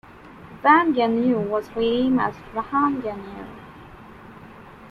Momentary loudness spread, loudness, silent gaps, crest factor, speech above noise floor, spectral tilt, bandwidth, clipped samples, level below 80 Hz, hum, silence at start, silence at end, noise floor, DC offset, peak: 24 LU; -21 LUFS; none; 20 dB; 23 dB; -7.5 dB/octave; 6.2 kHz; under 0.1%; -54 dBFS; none; 0.1 s; 0 s; -44 dBFS; under 0.1%; -4 dBFS